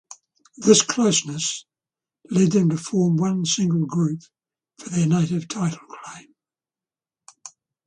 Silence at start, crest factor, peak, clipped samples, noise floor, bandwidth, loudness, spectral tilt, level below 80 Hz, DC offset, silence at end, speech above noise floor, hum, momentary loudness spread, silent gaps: 0.6 s; 22 dB; -2 dBFS; under 0.1%; under -90 dBFS; 10 kHz; -21 LUFS; -5 dB/octave; -64 dBFS; under 0.1%; 0.4 s; over 69 dB; none; 22 LU; none